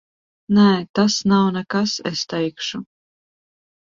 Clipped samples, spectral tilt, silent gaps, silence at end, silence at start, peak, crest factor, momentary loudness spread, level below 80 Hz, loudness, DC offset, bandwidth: under 0.1%; -5 dB/octave; 0.89-0.94 s; 1.15 s; 0.5 s; -4 dBFS; 16 dB; 11 LU; -58 dBFS; -19 LUFS; under 0.1%; 7.6 kHz